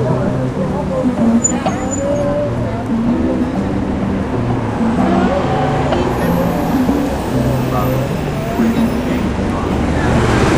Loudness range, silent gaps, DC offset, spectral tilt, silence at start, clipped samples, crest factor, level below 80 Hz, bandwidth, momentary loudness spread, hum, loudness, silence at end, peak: 1 LU; none; under 0.1%; -6 dB/octave; 0 s; under 0.1%; 14 dB; -28 dBFS; 16 kHz; 5 LU; none; -16 LUFS; 0 s; 0 dBFS